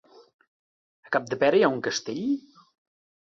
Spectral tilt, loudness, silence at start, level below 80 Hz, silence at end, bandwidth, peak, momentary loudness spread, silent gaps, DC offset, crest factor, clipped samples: -4.5 dB/octave; -25 LUFS; 1.1 s; -72 dBFS; 0.85 s; 7.6 kHz; -8 dBFS; 9 LU; none; under 0.1%; 20 dB; under 0.1%